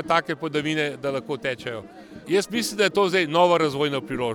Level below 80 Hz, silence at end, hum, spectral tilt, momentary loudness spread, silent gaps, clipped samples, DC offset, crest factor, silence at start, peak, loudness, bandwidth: -58 dBFS; 0 s; none; -4.5 dB/octave; 13 LU; none; under 0.1%; under 0.1%; 20 dB; 0 s; -4 dBFS; -23 LUFS; 19 kHz